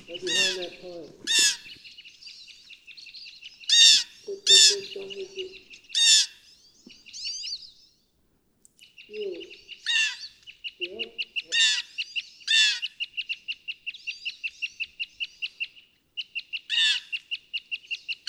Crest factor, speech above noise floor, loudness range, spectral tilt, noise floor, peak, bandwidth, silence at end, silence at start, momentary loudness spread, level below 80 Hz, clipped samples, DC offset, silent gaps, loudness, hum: 24 dB; 38 dB; 13 LU; 2.5 dB/octave; -68 dBFS; -4 dBFS; 15.5 kHz; 0.15 s; 0.1 s; 25 LU; -74 dBFS; under 0.1%; under 0.1%; none; -23 LUFS; none